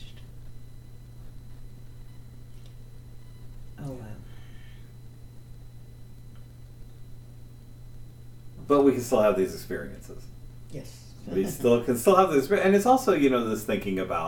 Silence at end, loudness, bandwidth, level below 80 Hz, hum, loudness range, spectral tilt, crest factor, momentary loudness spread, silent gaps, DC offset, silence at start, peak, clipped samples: 0 s; -24 LUFS; 18 kHz; -48 dBFS; none; 25 LU; -6 dB/octave; 24 dB; 27 LU; none; under 0.1%; 0 s; -6 dBFS; under 0.1%